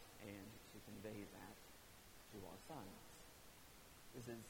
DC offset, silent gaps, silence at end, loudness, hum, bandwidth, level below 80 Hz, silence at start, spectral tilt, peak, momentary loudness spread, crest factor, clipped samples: under 0.1%; none; 0 s; -58 LUFS; none; 19 kHz; -72 dBFS; 0 s; -4.5 dB/octave; -40 dBFS; 8 LU; 18 dB; under 0.1%